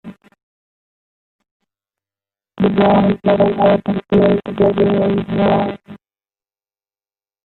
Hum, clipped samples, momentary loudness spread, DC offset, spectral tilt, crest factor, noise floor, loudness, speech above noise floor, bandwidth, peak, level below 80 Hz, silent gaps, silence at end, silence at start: none; under 0.1%; 5 LU; under 0.1%; -10 dB/octave; 16 dB; under -90 dBFS; -15 LUFS; over 76 dB; 4.3 kHz; -2 dBFS; -46 dBFS; 0.43-1.39 s, 1.51-1.60 s; 1.5 s; 0.05 s